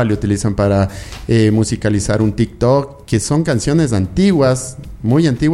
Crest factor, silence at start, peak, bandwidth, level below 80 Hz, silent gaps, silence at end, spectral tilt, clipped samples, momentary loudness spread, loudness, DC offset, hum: 14 dB; 0 s; -2 dBFS; 12.5 kHz; -34 dBFS; none; 0 s; -6.5 dB/octave; under 0.1%; 7 LU; -15 LUFS; under 0.1%; none